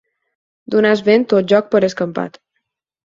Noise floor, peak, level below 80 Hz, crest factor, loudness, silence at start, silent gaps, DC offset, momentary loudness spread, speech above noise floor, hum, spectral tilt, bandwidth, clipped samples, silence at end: -74 dBFS; 0 dBFS; -60 dBFS; 16 dB; -15 LUFS; 0.7 s; none; under 0.1%; 10 LU; 59 dB; none; -6 dB/octave; 7.6 kHz; under 0.1%; 0.75 s